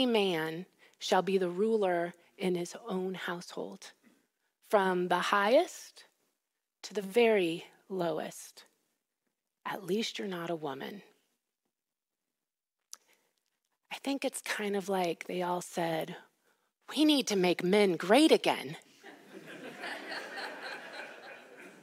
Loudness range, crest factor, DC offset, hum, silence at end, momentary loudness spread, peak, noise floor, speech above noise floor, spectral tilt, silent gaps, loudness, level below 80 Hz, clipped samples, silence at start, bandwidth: 12 LU; 22 dB; under 0.1%; none; 0.1 s; 22 LU; -10 dBFS; under -90 dBFS; over 59 dB; -4.5 dB/octave; none; -31 LUFS; under -90 dBFS; under 0.1%; 0 s; 16 kHz